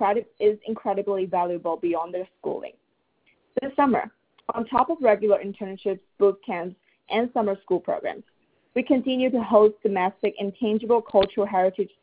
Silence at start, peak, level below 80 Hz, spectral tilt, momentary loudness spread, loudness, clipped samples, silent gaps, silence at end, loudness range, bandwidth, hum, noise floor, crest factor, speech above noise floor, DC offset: 0 s; -4 dBFS; -60 dBFS; -10 dB/octave; 12 LU; -24 LUFS; under 0.1%; none; 0.15 s; 5 LU; 4 kHz; none; -67 dBFS; 20 dB; 43 dB; under 0.1%